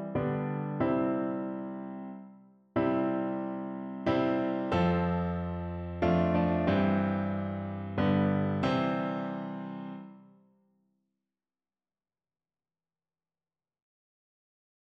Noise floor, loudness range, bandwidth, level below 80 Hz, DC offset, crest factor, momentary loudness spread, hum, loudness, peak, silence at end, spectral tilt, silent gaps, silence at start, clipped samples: under -90 dBFS; 8 LU; 6.4 kHz; -54 dBFS; under 0.1%; 18 dB; 12 LU; none; -31 LUFS; -14 dBFS; 4.6 s; -9 dB/octave; none; 0 s; under 0.1%